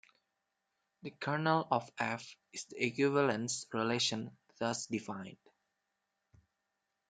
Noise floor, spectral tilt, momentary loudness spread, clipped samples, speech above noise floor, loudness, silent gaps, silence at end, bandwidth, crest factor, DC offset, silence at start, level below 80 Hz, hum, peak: -86 dBFS; -4 dB/octave; 16 LU; under 0.1%; 50 dB; -35 LUFS; none; 1.8 s; 9.6 kHz; 22 dB; under 0.1%; 1.05 s; -80 dBFS; none; -16 dBFS